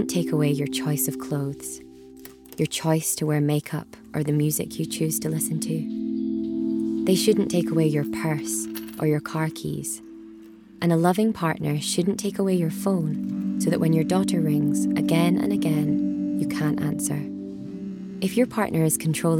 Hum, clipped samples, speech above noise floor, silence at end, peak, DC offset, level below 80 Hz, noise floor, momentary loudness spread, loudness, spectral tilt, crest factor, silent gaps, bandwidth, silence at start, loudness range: none; under 0.1%; 22 dB; 0 s; -6 dBFS; under 0.1%; -58 dBFS; -45 dBFS; 12 LU; -24 LUFS; -5.5 dB/octave; 18 dB; none; 18 kHz; 0 s; 4 LU